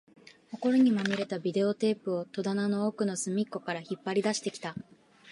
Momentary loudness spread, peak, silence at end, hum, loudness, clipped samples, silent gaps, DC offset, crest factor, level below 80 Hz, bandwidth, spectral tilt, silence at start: 11 LU; -14 dBFS; 0 s; none; -30 LUFS; under 0.1%; none; under 0.1%; 16 dB; -76 dBFS; 11.5 kHz; -5 dB/octave; 0.5 s